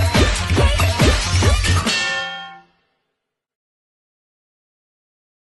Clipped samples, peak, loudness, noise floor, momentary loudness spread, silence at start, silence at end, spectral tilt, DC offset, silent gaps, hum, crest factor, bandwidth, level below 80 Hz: under 0.1%; -2 dBFS; -17 LUFS; -78 dBFS; 10 LU; 0 s; 2.85 s; -4 dB/octave; under 0.1%; none; none; 18 dB; 12 kHz; -26 dBFS